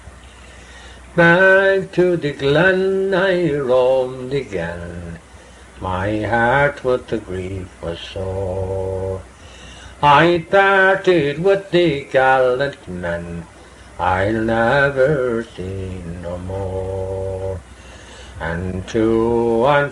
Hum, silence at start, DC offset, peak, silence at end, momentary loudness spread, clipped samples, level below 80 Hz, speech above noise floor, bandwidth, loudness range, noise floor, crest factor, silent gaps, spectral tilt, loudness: none; 0.05 s; under 0.1%; 0 dBFS; 0 s; 16 LU; under 0.1%; -40 dBFS; 25 dB; 11.5 kHz; 8 LU; -42 dBFS; 18 dB; none; -6.5 dB/octave; -17 LUFS